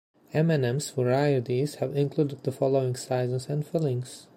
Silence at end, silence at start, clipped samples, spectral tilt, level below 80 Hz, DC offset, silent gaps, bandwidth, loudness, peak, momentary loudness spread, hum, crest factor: 0.15 s; 0.35 s; under 0.1%; -6.5 dB/octave; -68 dBFS; under 0.1%; none; 16 kHz; -27 LUFS; -10 dBFS; 5 LU; none; 16 dB